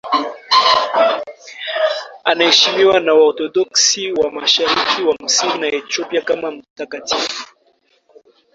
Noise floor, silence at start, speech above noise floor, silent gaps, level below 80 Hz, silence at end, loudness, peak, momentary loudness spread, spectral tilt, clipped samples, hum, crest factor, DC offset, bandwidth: -59 dBFS; 0.05 s; 43 dB; 6.70-6.76 s; -60 dBFS; 1.1 s; -15 LUFS; 0 dBFS; 13 LU; -0.5 dB/octave; under 0.1%; none; 16 dB; under 0.1%; 7.8 kHz